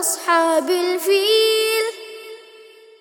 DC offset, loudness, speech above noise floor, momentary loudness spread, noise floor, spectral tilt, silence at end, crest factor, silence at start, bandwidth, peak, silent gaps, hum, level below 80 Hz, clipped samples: under 0.1%; -17 LUFS; 28 dB; 20 LU; -45 dBFS; 1 dB/octave; 0.4 s; 16 dB; 0 s; over 20 kHz; -4 dBFS; none; none; -76 dBFS; under 0.1%